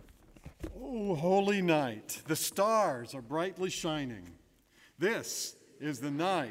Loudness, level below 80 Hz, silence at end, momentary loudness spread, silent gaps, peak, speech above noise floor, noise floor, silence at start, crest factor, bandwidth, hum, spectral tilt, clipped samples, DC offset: -33 LUFS; -60 dBFS; 0 s; 13 LU; none; -14 dBFS; 32 dB; -64 dBFS; 0 s; 20 dB; 16 kHz; none; -4.5 dB/octave; under 0.1%; under 0.1%